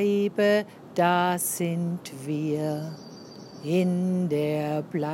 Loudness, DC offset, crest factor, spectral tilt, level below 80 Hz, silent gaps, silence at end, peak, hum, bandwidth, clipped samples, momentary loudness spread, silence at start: -26 LUFS; under 0.1%; 18 dB; -5.5 dB/octave; -76 dBFS; none; 0 s; -8 dBFS; none; 16.5 kHz; under 0.1%; 15 LU; 0 s